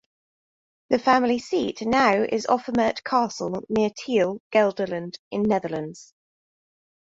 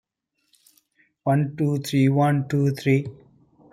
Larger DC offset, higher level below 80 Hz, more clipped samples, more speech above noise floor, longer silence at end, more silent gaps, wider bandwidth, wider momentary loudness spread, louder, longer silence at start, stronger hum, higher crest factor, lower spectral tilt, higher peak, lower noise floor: neither; about the same, -60 dBFS vs -62 dBFS; neither; first, over 67 dB vs 53 dB; first, 1 s vs 0.6 s; first, 4.40-4.50 s, 5.19-5.31 s vs none; second, 7.8 kHz vs 15 kHz; first, 10 LU vs 6 LU; about the same, -23 LUFS vs -22 LUFS; second, 0.9 s vs 1.25 s; neither; about the same, 18 dB vs 16 dB; second, -5 dB/octave vs -7.5 dB/octave; about the same, -6 dBFS vs -8 dBFS; first, under -90 dBFS vs -74 dBFS